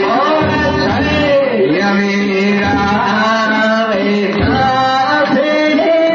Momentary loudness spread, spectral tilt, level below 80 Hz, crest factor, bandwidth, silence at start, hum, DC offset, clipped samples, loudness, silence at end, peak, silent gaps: 2 LU; -6 dB/octave; -34 dBFS; 10 dB; 7.2 kHz; 0 s; none; under 0.1%; under 0.1%; -12 LUFS; 0 s; -2 dBFS; none